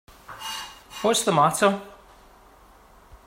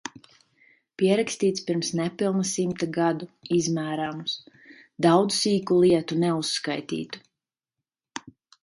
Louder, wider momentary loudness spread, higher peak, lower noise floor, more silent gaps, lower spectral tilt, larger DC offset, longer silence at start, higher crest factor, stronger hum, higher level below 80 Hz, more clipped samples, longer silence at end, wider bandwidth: about the same, -23 LUFS vs -25 LUFS; about the same, 18 LU vs 16 LU; about the same, -6 dBFS vs -6 dBFS; second, -52 dBFS vs -88 dBFS; neither; second, -3.5 dB/octave vs -5 dB/octave; neither; first, 0.3 s vs 0.05 s; about the same, 20 dB vs 20 dB; neither; first, -58 dBFS vs -66 dBFS; neither; first, 1.35 s vs 0.3 s; first, 16 kHz vs 11.5 kHz